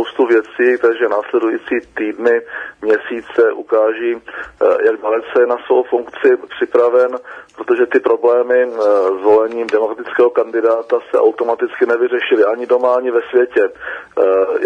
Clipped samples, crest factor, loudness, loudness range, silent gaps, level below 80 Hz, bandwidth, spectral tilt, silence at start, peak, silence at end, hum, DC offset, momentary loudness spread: under 0.1%; 14 dB; -15 LUFS; 2 LU; none; -60 dBFS; 6.8 kHz; -5 dB/octave; 0 s; 0 dBFS; 0 s; none; under 0.1%; 7 LU